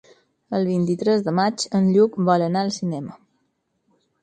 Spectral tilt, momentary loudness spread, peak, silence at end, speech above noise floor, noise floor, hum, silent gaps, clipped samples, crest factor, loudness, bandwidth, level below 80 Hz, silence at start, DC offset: -6.5 dB/octave; 10 LU; -4 dBFS; 1.05 s; 51 dB; -71 dBFS; none; none; under 0.1%; 18 dB; -21 LUFS; 9.4 kHz; -66 dBFS; 0.5 s; under 0.1%